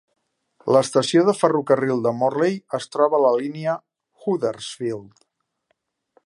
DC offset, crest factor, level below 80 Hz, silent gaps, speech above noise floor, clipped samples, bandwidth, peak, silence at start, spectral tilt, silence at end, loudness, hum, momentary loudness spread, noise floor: under 0.1%; 20 dB; -70 dBFS; none; 52 dB; under 0.1%; 11.5 kHz; -2 dBFS; 0.65 s; -5.5 dB/octave; 1.2 s; -21 LUFS; none; 12 LU; -72 dBFS